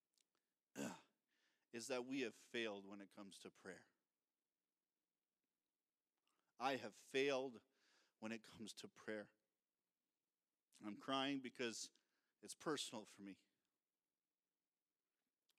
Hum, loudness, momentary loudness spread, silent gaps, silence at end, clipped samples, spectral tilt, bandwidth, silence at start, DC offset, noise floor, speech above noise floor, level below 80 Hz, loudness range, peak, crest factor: none; -49 LUFS; 17 LU; none; 2.25 s; under 0.1%; -3 dB/octave; 14.5 kHz; 0.75 s; under 0.1%; under -90 dBFS; over 41 dB; under -90 dBFS; 9 LU; -28 dBFS; 26 dB